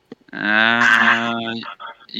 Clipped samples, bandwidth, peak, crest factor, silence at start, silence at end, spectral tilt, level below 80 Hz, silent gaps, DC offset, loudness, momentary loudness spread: under 0.1%; 15.5 kHz; 0 dBFS; 18 dB; 0.1 s; 0 s; -3 dB/octave; -70 dBFS; none; under 0.1%; -15 LUFS; 21 LU